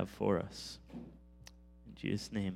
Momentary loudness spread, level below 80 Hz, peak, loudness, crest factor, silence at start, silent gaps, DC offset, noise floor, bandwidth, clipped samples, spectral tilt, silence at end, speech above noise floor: 23 LU; -60 dBFS; -18 dBFS; -39 LUFS; 22 dB; 0 s; none; under 0.1%; -58 dBFS; 15.5 kHz; under 0.1%; -6 dB/octave; 0 s; 20 dB